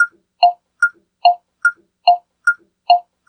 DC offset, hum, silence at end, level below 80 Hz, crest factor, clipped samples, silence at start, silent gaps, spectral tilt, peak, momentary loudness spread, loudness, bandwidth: under 0.1%; none; 0.3 s; -80 dBFS; 18 dB; under 0.1%; 0 s; none; 2 dB/octave; 0 dBFS; 3 LU; -17 LUFS; 9 kHz